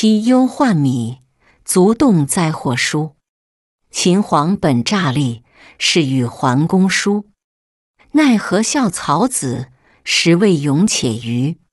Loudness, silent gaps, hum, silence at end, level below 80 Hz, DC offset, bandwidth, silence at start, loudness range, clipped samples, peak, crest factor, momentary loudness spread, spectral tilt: -15 LUFS; 3.29-3.79 s, 7.44-7.94 s; none; 0.2 s; -52 dBFS; under 0.1%; 12 kHz; 0 s; 2 LU; under 0.1%; -2 dBFS; 14 dB; 9 LU; -5 dB/octave